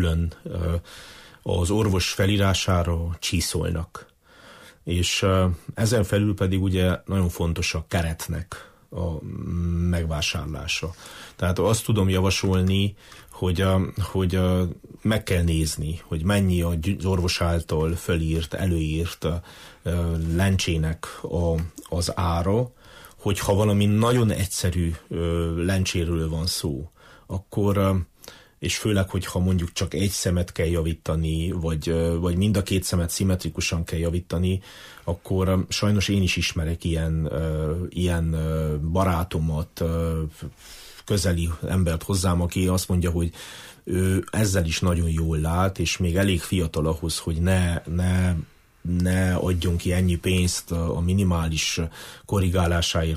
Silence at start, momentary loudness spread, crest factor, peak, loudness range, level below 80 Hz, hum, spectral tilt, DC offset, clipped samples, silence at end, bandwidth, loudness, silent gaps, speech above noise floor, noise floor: 0 s; 9 LU; 14 dB; -10 dBFS; 3 LU; -36 dBFS; none; -5.5 dB/octave; under 0.1%; under 0.1%; 0 s; 15.5 kHz; -24 LUFS; none; 26 dB; -50 dBFS